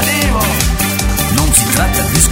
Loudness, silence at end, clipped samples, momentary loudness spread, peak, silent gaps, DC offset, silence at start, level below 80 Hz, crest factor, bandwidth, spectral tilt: -12 LUFS; 0 s; 0.2%; 4 LU; 0 dBFS; none; under 0.1%; 0 s; -18 dBFS; 12 dB; over 20 kHz; -3 dB/octave